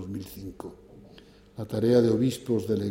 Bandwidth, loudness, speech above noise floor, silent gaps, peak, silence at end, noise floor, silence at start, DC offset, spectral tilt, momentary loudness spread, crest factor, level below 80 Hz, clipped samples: 16.5 kHz; -26 LUFS; 26 dB; none; -10 dBFS; 0 s; -52 dBFS; 0 s; under 0.1%; -7.5 dB/octave; 22 LU; 18 dB; -58 dBFS; under 0.1%